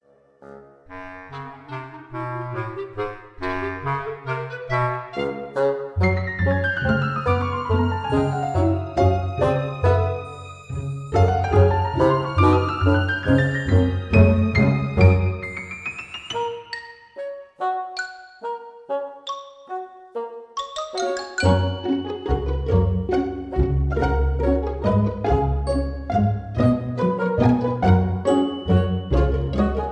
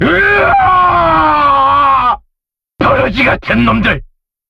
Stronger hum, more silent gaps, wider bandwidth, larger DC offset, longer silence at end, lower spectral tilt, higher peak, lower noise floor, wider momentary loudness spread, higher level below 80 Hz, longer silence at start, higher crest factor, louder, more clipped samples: neither; neither; first, 9.2 kHz vs 7.8 kHz; neither; second, 0 s vs 0.45 s; about the same, -7.5 dB/octave vs -7 dB/octave; about the same, -2 dBFS vs 0 dBFS; second, -49 dBFS vs -74 dBFS; first, 15 LU vs 6 LU; about the same, -32 dBFS vs -30 dBFS; first, 0.4 s vs 0 s; first, 18 dB vs 10 dB; second, -22 LUFS vs -9 LUFS; neither